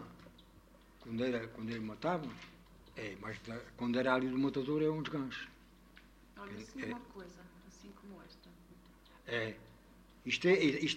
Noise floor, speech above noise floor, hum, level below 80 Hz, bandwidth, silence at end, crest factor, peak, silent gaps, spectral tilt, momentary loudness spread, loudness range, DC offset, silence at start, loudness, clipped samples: -62 dBFS; 25 dB; none; -64 dBFS; 16 kHz; 0 s; 22 dB; -18 dBFS; none; -5.5 dB/octave; 24 LU; 13 LU; under 0.1%; 0 s; -37 LUFS; under 0.1%